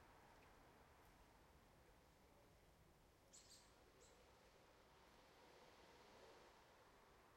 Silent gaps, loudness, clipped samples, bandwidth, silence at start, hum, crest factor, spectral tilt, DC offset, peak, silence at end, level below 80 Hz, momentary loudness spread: none; -68 LUFS; under 0.1%; 16 kHz; 0 s; none; 18 dB; -3.5 dB/octave; under 0.1%; -52 dBFS; 0 s; -80 dBFS; 4 LU